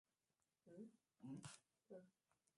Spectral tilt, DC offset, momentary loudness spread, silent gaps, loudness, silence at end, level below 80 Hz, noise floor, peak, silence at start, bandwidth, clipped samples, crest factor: -5 dB/octave; under 0.1%; 9 LU; none; -62 LUFS; 0.5 s; under -90 dBFS; under -90 dBFS; -38 dBFS; 0.65 s; 11.5 kHz; under 0.1%; 24 dB